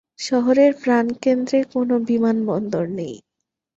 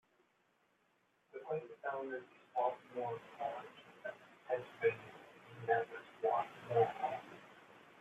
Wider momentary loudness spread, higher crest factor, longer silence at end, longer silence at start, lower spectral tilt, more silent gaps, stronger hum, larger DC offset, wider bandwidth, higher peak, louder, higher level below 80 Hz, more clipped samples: second, 9 LU vs 20 LU; second, 14 dB vs 22 dB; first, 0.6 s vs 0 s; second, 0.2 s vs 1.35 s; about the same, -6 dB/octave vs -6.5 dB/octave; neither; neither; neither; about the same, 8 kHz vs 8.4 kHz; first, -6 dBFS vs -20 dBFS; first, -19 LUFS vs -40 LUFS; first, -64 dBFS vs -86 dBFS; neither